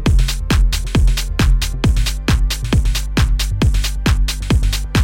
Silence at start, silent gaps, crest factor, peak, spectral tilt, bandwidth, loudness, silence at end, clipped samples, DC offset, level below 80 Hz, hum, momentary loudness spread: 0 s; none; 10 dB; -4 dBFS; -5 dB/octave; 17 kHz; -17 LUFS; 0 s; under 0.1%; under 0.1%; -16 dBFS; none; 1 LU